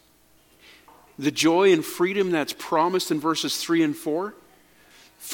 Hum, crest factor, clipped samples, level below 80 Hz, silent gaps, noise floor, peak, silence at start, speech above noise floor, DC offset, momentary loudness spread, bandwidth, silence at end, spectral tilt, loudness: none; 18 dB; under 0.1%; -70 dBFS; none; -59 dBFS; -6 dBFS; 1.2 s; 36 dB; under 0.1%; 10 LU; 17.5 kHz; 0 s; -4 dB/octave; -23 LUFS